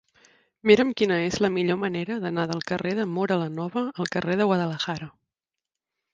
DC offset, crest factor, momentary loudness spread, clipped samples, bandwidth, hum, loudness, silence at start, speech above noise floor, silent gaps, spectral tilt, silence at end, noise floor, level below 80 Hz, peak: under 0.1%; 22 dB; 9 LU; under 0.1%; 7.8 kHz; none; -25 LUFS; 0.65 s; 64 dB; none; -6 dB/octave; 1.05 s; -88 dBFS; -62 dBFS; -4 dBFS